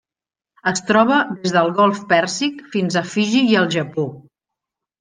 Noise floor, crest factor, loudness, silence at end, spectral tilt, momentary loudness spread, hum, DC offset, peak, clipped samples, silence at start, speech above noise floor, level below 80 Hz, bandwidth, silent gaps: under -90 dBFS; 18 dB; -18 LUFS; 0.8 s; -4.5 dB/octave; 8 LU; none; under 0.1%; -2 dBFS; under 0.1%; 0.65 s; over 73 dB; -64 dBFS; 10 kHz; none